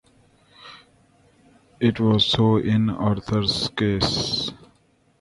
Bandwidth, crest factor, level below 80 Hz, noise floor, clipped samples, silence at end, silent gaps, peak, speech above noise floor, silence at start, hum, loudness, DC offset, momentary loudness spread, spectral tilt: 11.5 kHz; 18 dB; -46 dBFS; -61 dBFS; under 0.1%; 0.65 s; none; -6 dBFS; 41 dB; 0.6 s; none; -21 LUFS; under 0.1%; 7 LU; -6 dB/octave